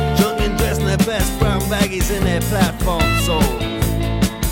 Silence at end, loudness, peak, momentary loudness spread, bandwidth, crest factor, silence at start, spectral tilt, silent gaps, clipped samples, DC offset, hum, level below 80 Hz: 0 s; -18 LUFS; -2 dBFS; 3 LU; 17 kHz; 16 dB; 0 s; -5 dB/octave; none; under 0.1%; under 0.1%; none; -24 dBFS